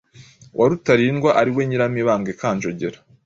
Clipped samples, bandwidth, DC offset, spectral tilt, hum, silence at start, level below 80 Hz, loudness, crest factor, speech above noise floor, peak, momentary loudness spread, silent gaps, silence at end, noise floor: under 0.1%; 7.8 kHz; under 0.1%; -6.5 dB/octave; none; 0.2 s; -56 dBFS; -19 LUFS; 18 dB; 28 dB; -2 dBFS; 11 LU; none; 0.3 s; -47 dBFS